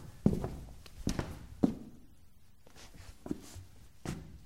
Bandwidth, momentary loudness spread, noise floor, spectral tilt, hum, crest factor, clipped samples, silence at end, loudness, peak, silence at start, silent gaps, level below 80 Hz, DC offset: 16 kHz; 21 LU; -62 dBFS; -7 dB/octave; none; 26 dB; under 0.1%; 0 s; -38 LUFS; -12 dBFS; 0 s; none; -50 dBFS; 0.2%